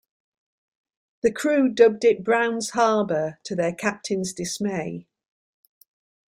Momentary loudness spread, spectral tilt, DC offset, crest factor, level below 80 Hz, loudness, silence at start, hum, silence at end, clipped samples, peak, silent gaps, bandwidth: 11 LU; -4.5 dB/octave; under 0.1%; 20 dB; -64 dBFS; -23 LUFS; 1.25 s; none; 1.3 s; under 0.1%; -4 dBFS; none; 15 kHz